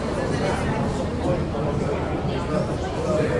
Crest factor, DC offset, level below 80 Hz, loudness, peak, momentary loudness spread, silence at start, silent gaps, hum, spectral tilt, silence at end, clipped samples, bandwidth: 14 dB; under 0.1%; -36 dBFS; -25 LUFS; -10 dBFS; 2 LU; 0 s; none; none; -7 dB/octave; 0 s; under 0.1%; 11.5 kHz